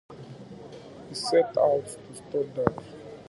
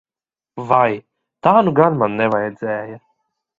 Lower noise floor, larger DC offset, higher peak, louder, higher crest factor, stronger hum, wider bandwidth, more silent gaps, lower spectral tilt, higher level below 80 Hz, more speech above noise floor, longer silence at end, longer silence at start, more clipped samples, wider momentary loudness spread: second, -44 dBFS vs under -90 dBFS; neither; about the same, -2 dBFS vs 0 dBFS; second, -27 LUFS vs -17 LUFS; first, 26 dB vs 18 dB; neither; first, 11.5 kHz vs 7.4 kHz; neither; second, -5 dB/octave vs -9 dB/octave; about the same, -60 dBFS vs -60 dBFS; second, 18 dB vs over 74 dB; second, 0.05 s vs 0.65 s; second, 0.1 s vs 0.55 s; neither; first, 21 LU vs 17 LU